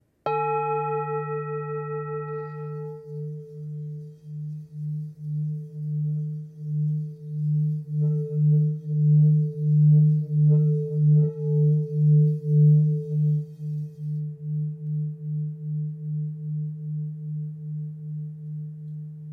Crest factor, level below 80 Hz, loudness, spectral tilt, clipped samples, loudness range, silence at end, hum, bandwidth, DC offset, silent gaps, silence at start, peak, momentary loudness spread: 14 dB; -74 dBFS; -25 LUFS; -12.5 dB/octave; under 0.1%; 13 LU; 0 s; none; 2.7 kHz; under 0.1%; none; 0.25 s; -12 dBFS; 16 LU